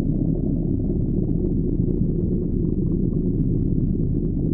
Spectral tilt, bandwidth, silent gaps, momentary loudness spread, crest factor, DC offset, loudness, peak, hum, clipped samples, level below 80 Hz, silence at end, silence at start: -17 dB/octave; 1.2 kHz; none; 1 LU; 14 dB; under 0.1%; -23 LUFS; -8 dBFS; none; under 0.1%; -26 dBFS; 0 s; 0 s